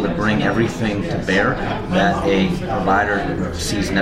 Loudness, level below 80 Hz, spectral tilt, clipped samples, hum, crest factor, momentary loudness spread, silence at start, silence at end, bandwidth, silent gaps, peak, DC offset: -19 LUFS; -34 dBFS; -5.5 dB/octave; under 0.1%; none; 14 dB; 5 LU; 0 s; 0 s; 15.5 kHz; none; -4 dBFS; under 0.1%